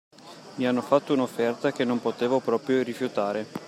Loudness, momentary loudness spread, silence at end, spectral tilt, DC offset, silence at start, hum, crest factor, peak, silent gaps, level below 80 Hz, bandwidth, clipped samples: -26 LUFS; 6 LU; 0 s; -6 dB/octave; under 0.1%; 0.25 s; none; 20 dB; -8 dBFS; none; -76 dBFS; 15 kHz; under 0.1%